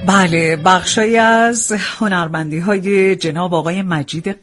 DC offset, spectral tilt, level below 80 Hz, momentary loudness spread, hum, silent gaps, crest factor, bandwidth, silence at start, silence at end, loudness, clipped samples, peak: under 0.1%; -4 dB/octave; -50 dBFS; 8 LU; none; none; 14 dB; 11.5 kHz; 0 s; 0.1 s; -14 LUFS; under 0.1%; 0 dBFS